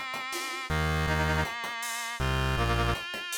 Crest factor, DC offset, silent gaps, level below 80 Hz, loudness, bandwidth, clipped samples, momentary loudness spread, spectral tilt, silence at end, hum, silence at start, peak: 12 dB; under 0.1%; none; -38 dBFS; -29 LUFS; 18 kHz; under 0.1%; 5 LU; -4 dB/octave; 0 s; none; 0 s; -18 dBFS